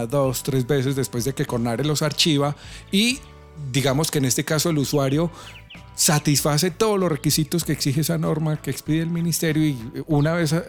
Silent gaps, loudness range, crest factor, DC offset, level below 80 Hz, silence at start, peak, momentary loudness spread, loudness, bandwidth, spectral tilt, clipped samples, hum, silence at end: none; 2 LU; 16 dB; under 0.1%; -48 dBFS; 0 s; -6 dBFS; 7 LU; -21 LUFS; 18.5 kHz; -4.5 dB/octave; under 0.1%; none; 0 s